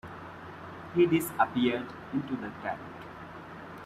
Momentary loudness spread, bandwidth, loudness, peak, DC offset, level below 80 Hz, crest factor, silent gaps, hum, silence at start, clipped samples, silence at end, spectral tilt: 18 LU; 15 kHz; -30 LUFS; -10 dBFS; under 0.1%; -64 dBFS; 22 dB; none; none; 0.05 s; under 0.1%; 0 s; -6 dB/octave